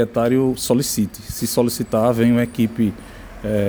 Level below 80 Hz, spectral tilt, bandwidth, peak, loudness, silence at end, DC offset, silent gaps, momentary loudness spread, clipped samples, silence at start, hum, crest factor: -42 dBFS; -5.5 dB/octave; over 20 kHz; -4 dBFS; -19 LUFS; 0 s; under 0.1%; none; 9 LU; under 0.1%; 0 s; none; 16 dB